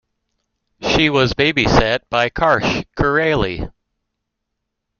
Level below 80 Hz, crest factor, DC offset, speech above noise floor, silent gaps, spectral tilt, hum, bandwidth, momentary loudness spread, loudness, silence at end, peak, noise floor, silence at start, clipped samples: -34 dBFS; 18 dB; under 0.1%; 61 dB; none; -5 dB/octave; none; 7.2 kHz; 9 LU; -16 LUFS; 1.3 s; 0 dBFS; -77 dBFS; 0.8 s; under 0.1%